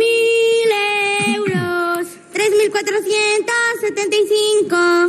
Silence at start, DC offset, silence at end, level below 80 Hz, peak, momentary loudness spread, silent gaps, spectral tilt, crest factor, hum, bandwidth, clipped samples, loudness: 0 s; under 0.1%; 0 s; -68 dBFS; -4 dBFS; 5 LU; none; -3 dB/octave; 10 dB; none; 14 kHz; under 0.1%; -16 LUFS